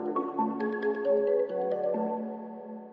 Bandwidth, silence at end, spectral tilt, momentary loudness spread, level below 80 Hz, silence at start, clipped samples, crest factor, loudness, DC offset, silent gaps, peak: 5.4 kHz; 0 s; -9.5 dB/octave; 13 LU; under -90 dBFS; 0 s; under 0.1%; 14 dB; -30 LUFS; under 0.1%; none; -16 dBFS